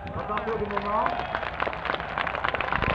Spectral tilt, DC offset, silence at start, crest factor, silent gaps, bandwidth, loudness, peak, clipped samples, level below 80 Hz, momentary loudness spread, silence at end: -6.5 dB/octave; under 0.1%; 0 s; 20 dB; none; 9 kHz; -28 LUFS; -8 dBFS; under 0.1%; -44 dBFS; 4 LU; 0 s